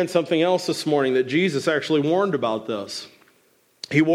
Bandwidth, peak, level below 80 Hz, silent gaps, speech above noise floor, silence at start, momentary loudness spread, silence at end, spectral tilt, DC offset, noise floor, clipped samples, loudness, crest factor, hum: 14.5 kHz; -6 dBFS; -70 dBFS; none; 40 dB; 0 s; 9 LU; 0 s; -5.5 dB/octave; under 0.1%; -61 dBFS; under 0.1%; -22 LUFS; 16 dB; none